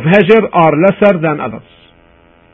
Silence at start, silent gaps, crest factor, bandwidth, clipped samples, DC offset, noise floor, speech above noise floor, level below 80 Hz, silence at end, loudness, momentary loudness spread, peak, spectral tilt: 0 s; none; 12 dB; 6.2 kHz; 0.3%; under 0.1%; -46 dBFS; 36 dB; -48 dBFS; 0.95 s; -10 LUFS; 14 LU; 0 dBFS; -9 dB/octave